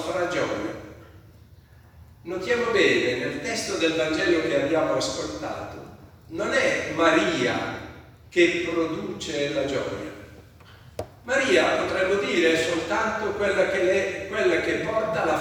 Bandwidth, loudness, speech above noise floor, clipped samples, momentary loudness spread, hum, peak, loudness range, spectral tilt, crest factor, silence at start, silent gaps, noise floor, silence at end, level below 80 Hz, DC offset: 16 kHz; -24 LUFS; 27 dB; under 0.1%; 16 LU; none; -4 dBFS; 4 LU; -4 dB/octave; 20 dB; 0 s; none; -51 dBFS; 0 s; -54 dBFS; under 0.1%